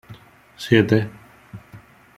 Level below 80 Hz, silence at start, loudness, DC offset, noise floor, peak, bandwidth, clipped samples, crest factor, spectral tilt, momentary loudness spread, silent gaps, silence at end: -56 dBFS; 0.1 s; -18 LUFS; under 0.1%; -46 dBFS; -2 dBFS; 14.5 kHz; under 0.1%; 22 dB; -7 dB/octave; 25 LU; none; 0.4 s